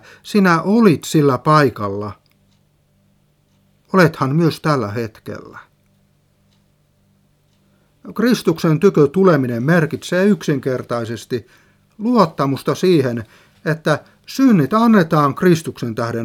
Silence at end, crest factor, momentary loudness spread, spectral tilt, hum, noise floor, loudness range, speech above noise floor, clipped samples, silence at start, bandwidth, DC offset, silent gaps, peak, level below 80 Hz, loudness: 0 s; 18 dB; 13 LU; -7 dB/octave; 50 Hz at -45 dBFS; -58 dBFS; 7 LU; 43 dB; under 0.1%; 0.25 s; 16.5 kHz; under 0.1%; none; 0 dBFS; -58 dBFS; -16 LUFS